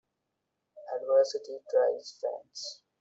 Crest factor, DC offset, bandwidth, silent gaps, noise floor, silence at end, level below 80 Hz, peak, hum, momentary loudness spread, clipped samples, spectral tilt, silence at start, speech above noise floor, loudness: 18 dB; under 0.1%; 8 kHz; none; -83 dBFS; 0.25 s; -84 dBFS; -14 dBFS; none; 14 LU; under 0.1%; -1 dB/octave; 0.75 s; 51 dB; -31 LUFS